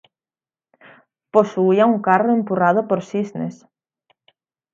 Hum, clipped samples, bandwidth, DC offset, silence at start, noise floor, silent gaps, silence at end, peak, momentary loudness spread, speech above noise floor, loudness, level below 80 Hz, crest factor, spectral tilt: none; under 0.1%; 7.4 kHz; under 0.1%; 1.35 s; under -90 dBFS; none; 1.2 s; 0 dBFS; 11 LU; over 73 dB; -18 LUFS; -70 dBFS; 20 dB; -8 dB/octave